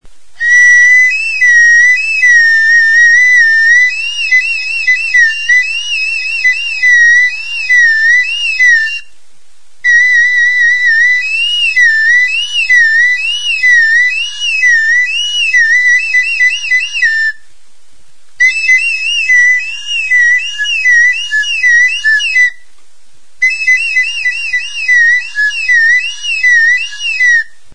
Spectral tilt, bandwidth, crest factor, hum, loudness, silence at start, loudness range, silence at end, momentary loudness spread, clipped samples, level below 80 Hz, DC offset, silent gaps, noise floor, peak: 5 dB/octave; 10.5 kHz; 10 dB; none; -7 LUFS; 0 s; 5 LU; 0.3 s; 8 LU; under 0.1%; -50 dBFS; 5%; none; -51 dBFS; 0 dBFS